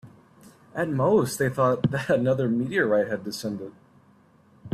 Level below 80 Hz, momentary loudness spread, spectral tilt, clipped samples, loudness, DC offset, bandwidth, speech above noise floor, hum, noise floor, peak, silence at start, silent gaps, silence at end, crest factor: -62 dBFS; 11 LU; -6.5 dB/octave; under 0.1%; -24 LUFS; under 0.1%; 15.5 kHz; 34 dB; none; -58 dBFS; -10 dBFS; 0.05 s; none; 0 s; 16 dB